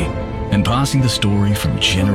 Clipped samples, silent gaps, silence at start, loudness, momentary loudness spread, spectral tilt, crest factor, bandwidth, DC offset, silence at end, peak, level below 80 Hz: under 0.1%; none; 0 s; -17 LUFS; 5 LU; -5 dB/octave; 12 dB; 16 kHz; under 0.1%; 0 s; -4 dBFS; -30 dBFS